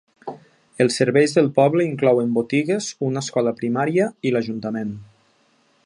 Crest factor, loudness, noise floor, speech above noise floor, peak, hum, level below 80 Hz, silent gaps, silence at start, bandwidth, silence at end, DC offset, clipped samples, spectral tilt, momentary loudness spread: 18 dB; -20 LUFS; -61 dBFS; 42 dB; -2 dBFS; none; -66 dBFS; none; 0.25 s; 11.5 kHz; 0.8 s; under 0.1%; under 0.1%; -5.5 dB/octave; 12 LU